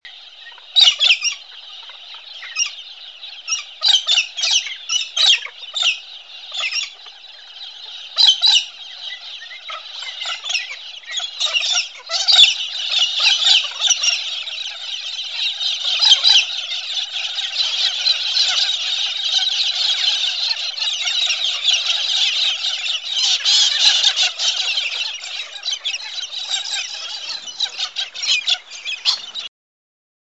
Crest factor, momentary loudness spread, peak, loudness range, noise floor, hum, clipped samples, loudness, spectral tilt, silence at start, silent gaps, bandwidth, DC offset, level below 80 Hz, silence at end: 20 dB; 19 LU; 0 dBFS; 7 LU; -40 dBFS; none; under 0.1%; -16 LUFS; 6 dB/octave; 0.05 s; none; 11 kHz; 0.2%; -76 dBFS; 0.9 s